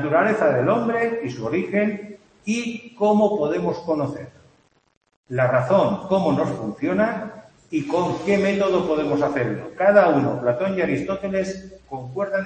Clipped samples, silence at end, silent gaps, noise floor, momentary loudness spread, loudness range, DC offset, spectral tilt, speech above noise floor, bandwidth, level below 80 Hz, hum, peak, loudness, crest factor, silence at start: under 0.1%; 0 s; 4.97-5.01 s, 5.16-5.24 s; -60 dBFS; 12 LU; 3 LU; under 0.1%; -7 dB/octave; 39 dB; 8.8 kHz; -56 dBFS; none; -2 dBFS; -21 LUFS; 20 dB; 0 s